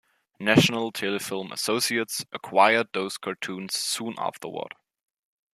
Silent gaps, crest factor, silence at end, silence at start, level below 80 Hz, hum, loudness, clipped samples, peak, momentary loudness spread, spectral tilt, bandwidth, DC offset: none; 24 dB; 0.85 s; 0.4 s; -68 dBFS; none; -25 LUFS; under 0.1%; -2 dBFS; 13 LU; -3.5 dB/octave; 15 kHz; under 0.1%